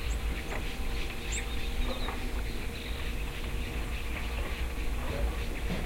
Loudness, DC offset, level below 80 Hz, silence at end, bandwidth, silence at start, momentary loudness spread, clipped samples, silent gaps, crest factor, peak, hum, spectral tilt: -36 LUFS; under 0.1%; -34 dBFS; 0 s; 16.5 kHz; 0 s; 3 LU; under 0.1%; none; 12 dB; -20 dBFS; none; -4.5 dB/octave